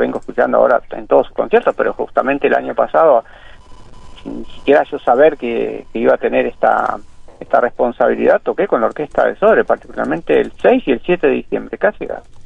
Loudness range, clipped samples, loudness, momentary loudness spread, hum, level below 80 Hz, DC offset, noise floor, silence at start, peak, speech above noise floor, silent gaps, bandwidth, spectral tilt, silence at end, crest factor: 2 LU; under 0.1%; -15 LUFS; 9 LU; none; -42 dBFS; 0.3%; -36 dBFS; 0 s; 0 dBFS; 21 dB; none; 8.4 kHz; -7 dB/octave; 0 s; 14 dB